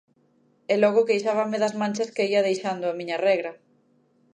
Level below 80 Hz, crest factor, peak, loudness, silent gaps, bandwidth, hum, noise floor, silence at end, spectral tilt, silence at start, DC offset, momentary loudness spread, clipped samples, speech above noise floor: -78 dBFS; 18 dB; -8 dBFS; -24 LUFS; none; 10.5 kHz; none; -64 dBFS; 0.8 s; -5 dB/octave; 0.7 s; under 0.1%; 8 LU; under 0.1%; 40 dB